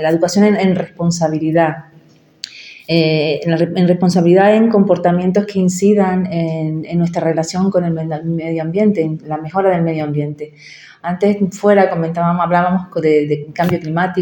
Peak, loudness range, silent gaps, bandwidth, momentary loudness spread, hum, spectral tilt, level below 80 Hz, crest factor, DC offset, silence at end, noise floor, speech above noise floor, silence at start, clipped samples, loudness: 0 dBFS; 4 LU; none; 17.5 kHz; 9 LU; none; -6.5 dB/octave; -56 dBFS; 14 dB; under 0.1%; 0 s; -47 dBFS; 33 dB; 0 s; under 0.1%; -15 LUFS